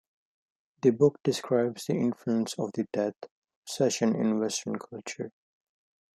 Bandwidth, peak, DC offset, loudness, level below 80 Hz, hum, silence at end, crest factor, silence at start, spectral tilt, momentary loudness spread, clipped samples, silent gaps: 13.5 kHz; -8 dBFS; under 0.1%; -28 LUFS; -74 dBFS; none; 0.85 s; 20 dB; 0.85 s; -5.5 dB/octave; 15 LU; under 0.1%; 3.31-3.42 s, 3.56-3.62 s